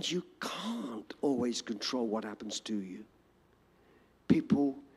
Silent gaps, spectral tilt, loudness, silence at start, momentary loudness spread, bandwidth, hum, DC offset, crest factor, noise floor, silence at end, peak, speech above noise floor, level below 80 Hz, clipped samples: none; -5 dB/octave; -34 LUFS; 0 s; 11 LU; 14 kHz; none; under 0.1%; 24 dB; -67 dBFS; 0.1 s; -12 dBFS; 33 dB; -70 dBFS; under 0.1%